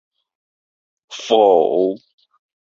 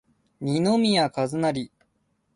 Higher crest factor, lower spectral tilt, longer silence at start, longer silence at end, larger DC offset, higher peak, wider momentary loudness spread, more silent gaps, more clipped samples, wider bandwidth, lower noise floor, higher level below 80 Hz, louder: about the same, 18 dB vs 16 dB; about the same, -4.5 dB/octave vs -5.5 dB/octave; first, 1.1 s vs 0.4 s; about the same, 0.75 s vs 0.7 s; neither; first, -2 dBFS vs -10 dBFS; first, 20 LU vs 13 LU; neither; neither; second, 7.6 kHz vs 11.5 kHz; first, under -90 dBFS vs -71 dBFS; about the same, -66 dBFS vs -64 dBFS; first, -15 LUFS vs -24 LUFS